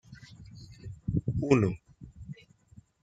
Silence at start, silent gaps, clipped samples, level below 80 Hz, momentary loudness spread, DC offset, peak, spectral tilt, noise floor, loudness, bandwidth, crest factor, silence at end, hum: 0.1 s; none; under 0.1%; -50 dBFS; 24 LU; under 0.1%; -8 dBFS; -8 dB/octave; -58 dBFS; -29 LUFS; 9.2 kHz; 24 dB; 0.7 s; none